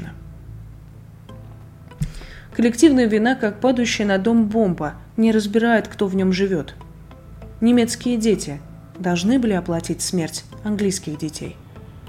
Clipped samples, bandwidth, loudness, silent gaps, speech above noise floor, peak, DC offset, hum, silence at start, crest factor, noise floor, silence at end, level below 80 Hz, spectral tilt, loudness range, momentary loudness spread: under 0.1%; 15 kHz; -20 LUFS; none; 23 dB; -2 dBFS; under 0.1%; none; 0 s; 18 dB; -41 dBFS; 0 s; -44 dBFS; -5 dB/octave; 4 LU; 23 LU